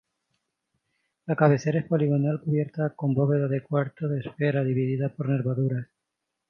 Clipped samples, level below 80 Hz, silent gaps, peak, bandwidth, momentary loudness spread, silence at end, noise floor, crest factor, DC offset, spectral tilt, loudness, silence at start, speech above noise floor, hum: under 0.1%; -68 dBFS; none; -4 dBFS; 6.6 kHz; 8 LU; 0.65 s; -83 dBFS; 22 dB; under 0.1%; -9 dB/octave; -26 LUFS; 1.25 s; 58 dB; none